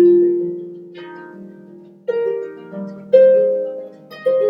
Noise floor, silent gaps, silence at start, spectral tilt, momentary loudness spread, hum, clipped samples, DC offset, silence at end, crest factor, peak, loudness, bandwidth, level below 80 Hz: -41 dBFS; none; 0 s; -9 dB/octave; 24 LU; none; under 0.1%; under 0.1%; 0 s; 16 dB; 0 dBFS; -16 LUFS; 5.4 kHz; -72 dBFS